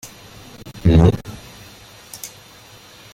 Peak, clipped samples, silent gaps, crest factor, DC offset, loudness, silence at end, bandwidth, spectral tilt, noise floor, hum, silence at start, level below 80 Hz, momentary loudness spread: -2 dBFS; under 0.1%; none; 20 dB; under 0.1%; -16 LUFS; 0.85 s; 16 kHz; -7 dB/octave; -44 dBFS; none; 0.05 s; -32 dBFS; 27 LU